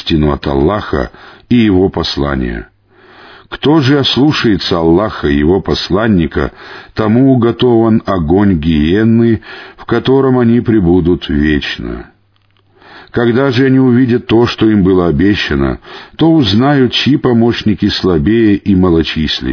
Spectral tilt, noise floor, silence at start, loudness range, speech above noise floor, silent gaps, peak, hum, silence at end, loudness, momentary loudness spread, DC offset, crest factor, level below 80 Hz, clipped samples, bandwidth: -7.5 dB/octave; -53 dBFS; 0 s; 3 LU; 43 dB; none; 0 dBFS; none; 0 s; -11 LUFS; 9 LU; under 0.1%; 10 dB; -28 dBFS; under 0.1%; 5.4 kHz